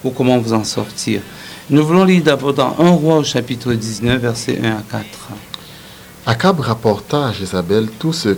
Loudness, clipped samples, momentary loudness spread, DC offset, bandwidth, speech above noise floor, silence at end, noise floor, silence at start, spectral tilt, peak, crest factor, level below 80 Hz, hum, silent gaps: -16 LUFS; under 0.1%; 19 LU; under 0.1%; 20 kHz; 22 dB; 0 s; -37 dBFS; 0 s; -5.5 dB/octave; 0 dBFS; 16 dB; -46 dBFS; none; none